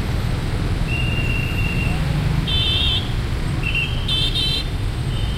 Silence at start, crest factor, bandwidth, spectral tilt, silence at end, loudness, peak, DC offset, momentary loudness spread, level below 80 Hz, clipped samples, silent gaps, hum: 0 s; 14 dB; 16 kHz; -5 dB/octave; 0 s; -20 LUFS; -6 dBFS; under 0.1%; 6 LU; -24 dBFS; under 0.1%; none; none